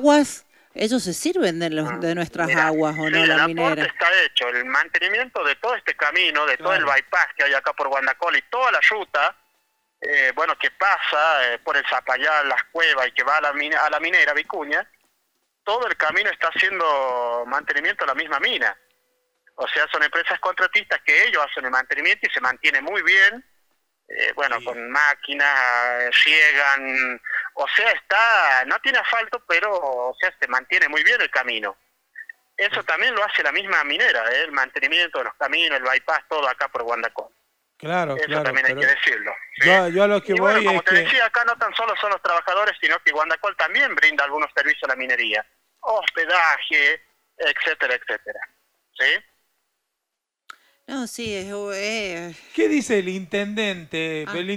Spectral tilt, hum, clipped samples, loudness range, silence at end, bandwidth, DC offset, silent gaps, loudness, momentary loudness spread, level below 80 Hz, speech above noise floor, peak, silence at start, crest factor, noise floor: -3 dB/octave; none; under 0.1%; 5 LU; 0 s; 16.5 kHz; under 0.1%; none; -19 LUFS; 10 LU; -66 dBFS; 62 dB; -2 dBFS; 0 s; 20 dB; -83 dBFS